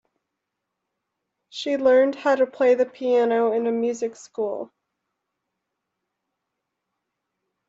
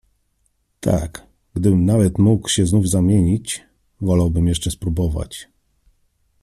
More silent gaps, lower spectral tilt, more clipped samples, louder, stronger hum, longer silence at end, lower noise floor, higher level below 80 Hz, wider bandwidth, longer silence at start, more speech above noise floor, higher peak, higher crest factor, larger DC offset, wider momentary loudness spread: neither; second, -4 dB/octave vs -6 dB/octave; neither; second, -22 LUFS vs -18 LUFS; neither; first, 3.05 s vs 1 s; first, -82 dBFS vs -66 dBFS; second, -74 dBFS vs -36 dBFS; second, 7.8 kHz vs 13.5 kHz; first, 1.55 s vs 0.85 s; first, 61 dB vs 49 dB; second, -8 dBFS vs -4 dBFS; about the same, 18 dB vs 16 dB; neither; about the same, 13 LU vs 14 LU